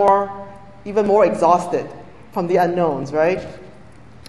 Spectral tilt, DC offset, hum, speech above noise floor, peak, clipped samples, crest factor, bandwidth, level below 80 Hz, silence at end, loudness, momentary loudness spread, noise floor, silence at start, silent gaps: -6.5 dB/octave; 0.6%; none; 27 dB; 0 dBFS; under 0.1%; 18 dB; 12 kHz; -52 dBFS; 0.6 s; -18 LUFS; 20 LU; -44 dBFS; 0 s; none